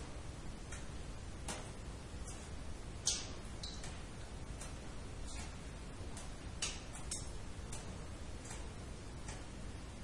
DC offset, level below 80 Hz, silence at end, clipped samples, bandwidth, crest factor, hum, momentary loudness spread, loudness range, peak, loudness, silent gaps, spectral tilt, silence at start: under 0.1%; -50 dBFS; 0 s; under 0.1%; 11.5 kHz; 26 dB; none; 8 LU; 4 LU; -20 dBFS; -46 LUFS; none; -3 dB/octave; 0 s